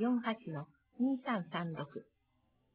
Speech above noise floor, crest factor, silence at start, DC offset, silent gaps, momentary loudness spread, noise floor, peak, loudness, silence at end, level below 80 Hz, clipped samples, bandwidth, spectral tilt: 39 dB; 18 dB; 0 s; under 0.1%; none; 14 LU; -77 dBFS; -20 dBFS; -38 LUFS; 0.75 s; -80 dBFS; under 0.1%; 4 kHz; -5.5 dB/octave